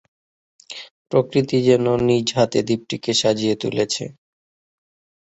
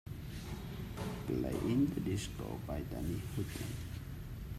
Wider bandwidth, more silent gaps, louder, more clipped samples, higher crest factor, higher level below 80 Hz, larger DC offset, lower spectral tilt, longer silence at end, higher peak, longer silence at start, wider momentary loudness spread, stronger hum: second, 8.2 kHz vs 16 kHz; first, 0.91-1.05 s vs none; first, -19 LUFS vs -40 LUFS; neither; about the same, 18 dB vs 16 dB; second, -56 dBFS vs -50 dBFS; neither; second, -5 dB/octave vs -6.5 dB/octave; first, 1.1 s vs 0 s; first, -2 dBFS vs -22 dBFS; first, 0.7 s vs 0.05 s; first, 18 LU vs 12 LU; neither